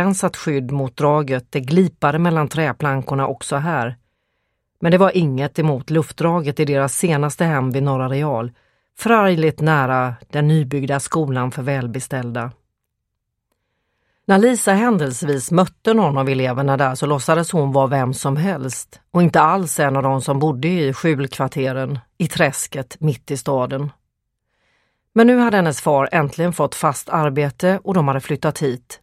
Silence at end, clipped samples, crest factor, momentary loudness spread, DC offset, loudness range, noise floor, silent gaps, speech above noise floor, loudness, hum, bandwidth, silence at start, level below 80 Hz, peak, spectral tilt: 0.05 s; under 0.1%; 18 dB; 9 LU; under 0.1%; 4 LU; -77 dBFS; none; 59 dB; -18 LUFS; none; 15 kHz; 0 s; -56 dBFS; 0 dBFS; -6 dB/octave